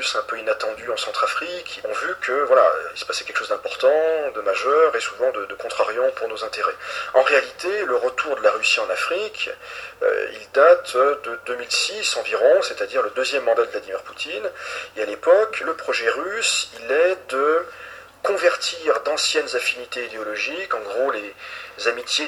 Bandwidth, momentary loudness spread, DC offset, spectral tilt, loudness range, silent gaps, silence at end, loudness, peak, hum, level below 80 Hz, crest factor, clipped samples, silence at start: 13.5 kHz; 11 LU; under 0.1%; -0.5 dB/octave; 3 LU; none; 0 s; -21 LUFS; -2 dBFS; none; -66 dBFS; 20 dB; under 0.1%; 0 s